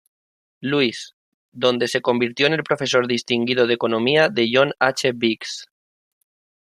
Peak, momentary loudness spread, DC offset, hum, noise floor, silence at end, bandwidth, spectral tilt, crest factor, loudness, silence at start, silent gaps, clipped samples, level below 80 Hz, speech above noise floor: -2 dBFS; 10 LU; under 0.1%; none; under -90 dBFS; 1.05 s; 15 kHz; -4 dB/octave; 20 dB; -19 LUFS; 0.6 s; 1.13-1.52 s; under 0.1%; -66 dBFS; over 70 dB